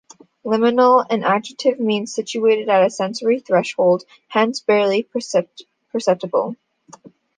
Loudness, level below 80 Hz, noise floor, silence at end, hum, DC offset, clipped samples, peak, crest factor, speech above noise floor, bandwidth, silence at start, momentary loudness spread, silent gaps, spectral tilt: -18 LUFS; -72 dBFS; -46 dBFS; 0.3 s; none; under 0.1%; under 0.1%; -2 dBFS; 16 dB; 28 dB; 9.8 kHz; 0.45 s; 8 LU; none; -4.5 dB/octave